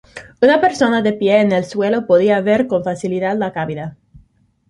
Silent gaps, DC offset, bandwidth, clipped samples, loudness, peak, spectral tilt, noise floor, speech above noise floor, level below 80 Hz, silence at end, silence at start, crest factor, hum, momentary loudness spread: none; under 0.1%; 11.5 kHz; under 0.1%; -16 LUFS; 0 dBFS; -6 dB/octave; -54 dBFS; 39 dB; -54 dBFS; 0.75 s; 0.15 s; 16 dB; none; 9 LU